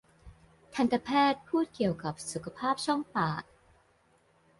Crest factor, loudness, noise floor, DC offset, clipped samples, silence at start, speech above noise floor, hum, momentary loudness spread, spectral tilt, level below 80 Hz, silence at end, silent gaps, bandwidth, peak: 18 dB; -31 LUFS; -67 dBFS; under 0.1%; under 0.1%; 0.25 s; 37 dB; none; 11 LU; -5 dB/octave; -62 dBFS; 1.15 s; none; 11.5 kHz; -14 dBFS